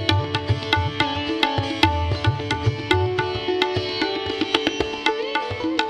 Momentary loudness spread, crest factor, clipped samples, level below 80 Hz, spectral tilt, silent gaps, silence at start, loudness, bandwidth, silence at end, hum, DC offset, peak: 4 LU; 22 dB; under 0.1%; -40 dBFS; -5.5 dB/octave; none; 0 s; -22 LUFS; 12.5 kHz; 0 s; none; under 0.1%; -2 dBFS